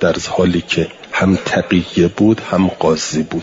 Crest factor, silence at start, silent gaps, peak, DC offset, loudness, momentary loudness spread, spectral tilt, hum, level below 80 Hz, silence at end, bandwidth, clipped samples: 14 dB; 0 s; none; -2 dBFS; under 0.1%; -15 LUFS; 5 LU; -5.5 dB/octave; none; -46 dBFS; 0 s; 7.8 kHz; under 0.1%